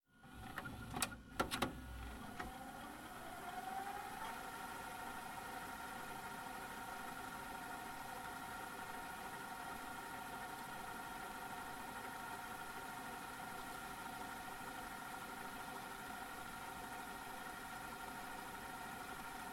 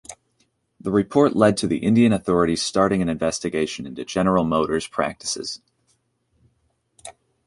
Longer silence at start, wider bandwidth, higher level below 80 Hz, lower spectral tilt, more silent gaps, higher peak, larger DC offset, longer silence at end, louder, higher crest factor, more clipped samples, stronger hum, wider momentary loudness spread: about the same, 0.1 s vs 0.1 s; first, 16.5 kHz vs 11.5 kHz; second, -64 dBFS vs -50 dBFS; second, -3 dB/octave vs -5.5 dB/octave; neither; second, -22 dBFS vs -4 dBFS; neither; second, 0 s vs 0.35 s; second, -48 LUFS vs -21 LUFS; first, 26 dB vs 18 dB; neither; neither; second, 4 LU vs 17 LU